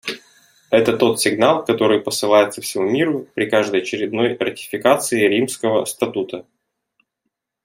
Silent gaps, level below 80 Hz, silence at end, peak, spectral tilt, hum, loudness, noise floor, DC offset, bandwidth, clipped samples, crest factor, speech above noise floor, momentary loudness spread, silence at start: none; -64 dBFS; 1.25 s; -2 dBFS; -4 dB/octave; none; -18 LUFS; -77 dBFS; under 0.1%; 16.5 kHz; under 0.1%; 18 dB; 60 dB; 8 LU; 0.05 s